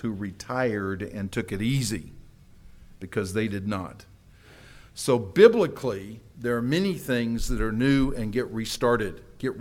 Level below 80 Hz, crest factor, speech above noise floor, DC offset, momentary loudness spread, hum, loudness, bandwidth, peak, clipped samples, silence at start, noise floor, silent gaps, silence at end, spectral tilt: -40 dBFS; 24 dB; 26 dB; under 0.1%; 12 LU; none; -26 LUFS; 17 kHz; -2 dBFS; under 0.1%; 0 s; -52 dBFS; none; 0 s; -5.5 dB/octave